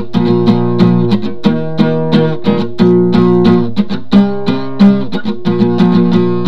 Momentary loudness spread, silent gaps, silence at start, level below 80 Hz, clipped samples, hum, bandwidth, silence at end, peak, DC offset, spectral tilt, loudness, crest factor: 6 LU; none; 0 s; -42 dBFS; under 0.1%; none; 6.2 kHz; 0 s; 0 dBFS; 9%; -9 dB/octave; -11 LUFS; 12 dB